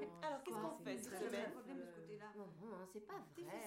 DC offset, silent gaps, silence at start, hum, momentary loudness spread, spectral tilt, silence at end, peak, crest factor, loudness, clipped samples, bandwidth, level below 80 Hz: under 0.1%; none; 0 s; none; 9 LU; -4.5 dB/octave; 0 s; -32 dBFS; 16 dB; -50 LUFS; under 0.1%; 16 kHz; -86 dBFS